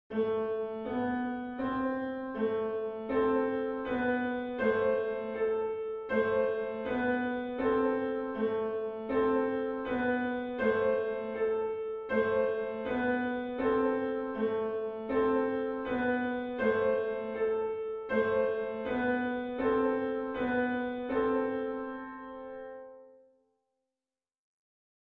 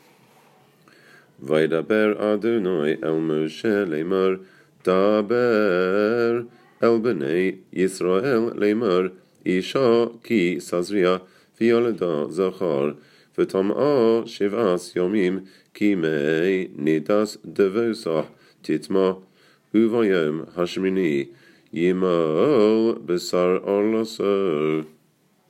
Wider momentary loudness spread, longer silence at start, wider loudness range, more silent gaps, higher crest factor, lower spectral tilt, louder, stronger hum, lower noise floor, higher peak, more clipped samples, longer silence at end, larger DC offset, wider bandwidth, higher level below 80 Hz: about the same, 7 LU vs 8 LU; second, 0.1 s vs 1.4 s; about the same, 2 LU vs 2 LU; neither; about the same, 16 dB vs 18 dB; first, -8.5 dB/octave vs -6.5 dB/octave; second, -32 LUFS vs -22 LUFS; neither; first, under -90 dBFS vs -62 dBFS; second, -16 dBFS vs -4 dBFS; neither; first, 1.9 s vs 0.6 s; neither; second, 4.6 kHz vs 13.5 kHz; first, -62 dBFS vs -70 dBFS